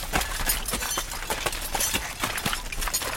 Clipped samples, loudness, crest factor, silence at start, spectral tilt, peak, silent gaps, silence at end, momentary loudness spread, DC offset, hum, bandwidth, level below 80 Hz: under 0.1%; -27 LUFS; 20 dB; 0 s; -1.5 dB/octave; -8 dBFS; none; 0 s; 4 LU; under 0.1%; none; 17 kHz; -36 dBFS